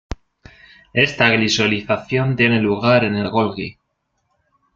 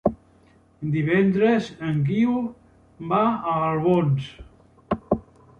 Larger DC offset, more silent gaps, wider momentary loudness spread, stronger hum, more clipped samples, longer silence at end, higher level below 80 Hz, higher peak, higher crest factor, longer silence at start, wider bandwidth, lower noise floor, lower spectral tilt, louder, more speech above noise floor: neither; neither; first, 14 LU vs 11 LU; neither; neither; first, 1.05 s vs 0.4 s; first, -44 dBFS vs -50 dBFS; first, -2 dBFS vs -6 dBFS; about the same, 18 dB vs 18 dB; about the same, 0.1 s vs 0.05 s; about the same, 7.6 kHz vs 8.2 kHz; first, -71 dBFS vs -56 dBFS; second, -5 dB/octave vs -8.5 dB/octave; first, -17 LUFS vs -23 LUFS; first, 54 dB vs 35 dB